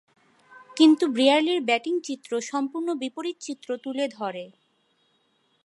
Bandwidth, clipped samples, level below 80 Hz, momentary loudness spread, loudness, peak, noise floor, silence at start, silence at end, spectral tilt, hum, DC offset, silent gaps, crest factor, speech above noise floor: 11.5 kHz; under 0.1%; -84 dBFS; 14 LU; -24 LUFS; -6 dBFS; -68 dBFS; 0.5 s; 1.15 s; -3 dB/octave; none; under 0.1%; none; 20 dB; 44 dB